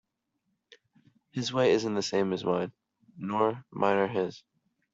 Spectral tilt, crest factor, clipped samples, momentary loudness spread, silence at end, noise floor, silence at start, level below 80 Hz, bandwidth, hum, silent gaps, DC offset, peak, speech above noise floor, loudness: -5 dB/octave; 22 dB; under 0.1%; 11 LU; 0.55 s; -80 dBFS; 1.35 s; -72 dBFS; 7.8 kHz; none; none; under 0.1%; -10 dBFS; 52 dB; -29 LUFS